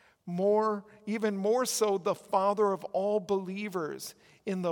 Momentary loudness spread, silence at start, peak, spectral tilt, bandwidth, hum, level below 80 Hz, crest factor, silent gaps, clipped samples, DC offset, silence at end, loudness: 11 LU; 0.25 s; -14 dBFS; -4.5 dB/octave; 18 kHz; none; -80 dBFS; 18 dB; none; under 0.1%; under 0.1%; 0 s; -30 LUFS